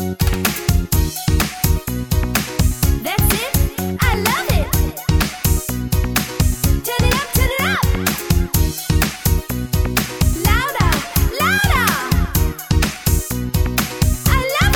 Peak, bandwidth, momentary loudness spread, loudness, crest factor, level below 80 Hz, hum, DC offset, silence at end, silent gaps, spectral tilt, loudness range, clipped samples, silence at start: 0 dBFS; over 20 kHz; 4 LU; -18 LUFS; 16 dB; -22 dBFS; none; under 0.1%; 0 s; none; -4.5 dB/octave; 1 LU; under 0.1%; 0 s